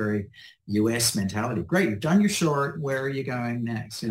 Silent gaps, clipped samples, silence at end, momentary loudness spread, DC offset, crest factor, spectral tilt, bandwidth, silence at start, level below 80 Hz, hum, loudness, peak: none; under 0.1%; 0 s; 9 LU; under 0.1%; 16 dB; -5 dB/octave; 16 kHz; 0 s; -58 dBFS; none; -25 LUFS; -10 dBFS